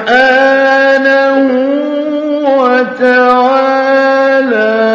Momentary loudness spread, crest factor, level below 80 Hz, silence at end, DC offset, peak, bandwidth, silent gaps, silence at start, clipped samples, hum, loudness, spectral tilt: 6 LU; 8 dB; -54 dBFS; 0 s; under 0.1%; 0 dBFS; 7.4 kHz; none; 0 s; 0.3%; none; -9 LUFS; -4.5 dB/octave